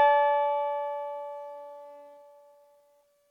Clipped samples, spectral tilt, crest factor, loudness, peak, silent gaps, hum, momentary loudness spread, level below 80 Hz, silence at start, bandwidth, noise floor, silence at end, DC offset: under 0.1%; -1.5 dB/octave; 18 dB; -28 LUFS; -12 dBFS; none; none; 24 LU; under -90 dBFS; 0 s; 4.7 kHz; -66 dBFS; 1.15 s; under 0.1%